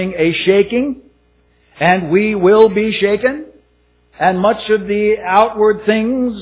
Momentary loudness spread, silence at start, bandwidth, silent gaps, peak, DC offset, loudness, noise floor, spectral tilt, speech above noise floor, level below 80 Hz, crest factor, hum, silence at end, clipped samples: 7 LU; 0 s; 4 kHz; none; 0 dBFS; under 0.1%; -14 LUFS; -55 dBFS; -10 dB/octave; 42 dB; -46 dBFS; 14 dB; 60 Hz at -40 dBFS; 0 s; under 0.1%